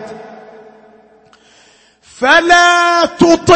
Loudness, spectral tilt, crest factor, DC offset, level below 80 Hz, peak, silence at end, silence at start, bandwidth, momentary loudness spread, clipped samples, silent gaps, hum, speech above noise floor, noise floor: -9 LUFS; -3.5 dB/octave; 12 dB; under 0.1%; -46 dBFS; 0 dBFS; 0 s; 0 s; 8.8 kHz; 18 LU; 0.1%; none; none; 39 dB; -48 dBFS